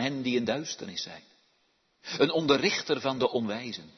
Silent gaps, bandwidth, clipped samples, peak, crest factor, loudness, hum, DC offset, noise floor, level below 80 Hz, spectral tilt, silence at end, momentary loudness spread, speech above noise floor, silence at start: none; 6.4 kHz; under 0.1%; -8 dBFS; 22 dB; -29 LUFS; none; under 0.1%; -71 dBFS; -70 dBFS; -4 dB/octave; 0.1 s; 14 LU; 42 dB; 0 s